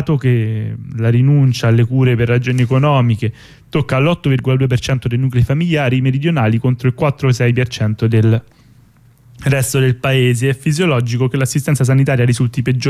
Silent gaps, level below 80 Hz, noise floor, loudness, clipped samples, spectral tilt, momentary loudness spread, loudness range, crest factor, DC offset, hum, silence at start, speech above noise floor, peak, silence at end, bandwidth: none; -40 dBFS; -47 dBFS; -15 LUFS; under 0.1%; -6.5 dB/octave; 5 LU; 2 LU; 10 dB; under 0.1%; none; 0 s; 33 dB; -4 dBFS; 0 s; 14 kHz